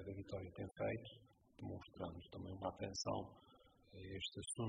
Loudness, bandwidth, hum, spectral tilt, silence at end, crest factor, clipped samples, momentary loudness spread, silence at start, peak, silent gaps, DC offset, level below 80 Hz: -48 LUFS; 7.4 kHz; none; -4.5 dB/octave; 0 s; 20 dB; under 0.1%; 14 LU; 0 s; -28 dBFS; none; under 0.1%; -70 dBFS